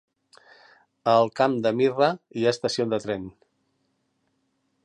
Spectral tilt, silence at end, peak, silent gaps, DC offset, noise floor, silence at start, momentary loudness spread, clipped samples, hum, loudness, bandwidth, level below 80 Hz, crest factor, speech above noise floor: -5.5 dB/octave; 1.55 s; -6 dBFS; none; under 0.1%; -73 dBFS; 1.05 s; 10 LU; under 0.1%; none; -24 LUFS; 11 kHz; -66 dBFS; 20 dB; 50 dB